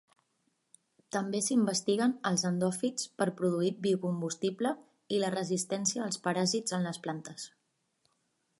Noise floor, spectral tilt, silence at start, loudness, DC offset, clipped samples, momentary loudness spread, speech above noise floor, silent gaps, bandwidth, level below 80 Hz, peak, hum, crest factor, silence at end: -77 dBFS; -4.5 dB/octave; 1.15 s; -32 LUFS; under 0.1%; under 0.1%; 9 LU; 46 dB; none; 11.5 kHz; -78 dBFS; -14 dBFS; none; 18 dB; 1.1 s